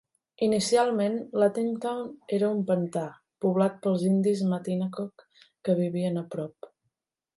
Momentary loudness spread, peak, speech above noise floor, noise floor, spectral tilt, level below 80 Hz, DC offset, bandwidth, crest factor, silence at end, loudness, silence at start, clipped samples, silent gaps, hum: 12 LU; -10 dBFS; 55 dB; -81 dBFS; -6.5 dB/octave; -72 dBFS; under 0.1%; 11.5 kHz; 18 dB; 0.7 s; -27 LUFS; 0.4 s; under 0.1%; none; none